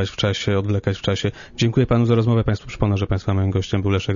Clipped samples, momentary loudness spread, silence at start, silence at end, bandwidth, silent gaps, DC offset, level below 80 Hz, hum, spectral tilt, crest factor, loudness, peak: under 0.1%; 6 LU; 0 s; 0 s; 7.4 kHz; none; under 0.1%; -38 dBFS; none; -6.5 dB/octave; 16 dB; -20 LUFS; -4 dBFS